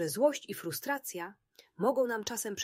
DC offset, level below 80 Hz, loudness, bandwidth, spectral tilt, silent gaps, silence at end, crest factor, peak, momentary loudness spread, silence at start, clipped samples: under 0.1%; -76 dBFS; -33 LUFS; 16 kHz; -3.5 dB/octave; none; 0 s; 18 dB; -14 dBFS; 11 LU; 0 s; under 0.1%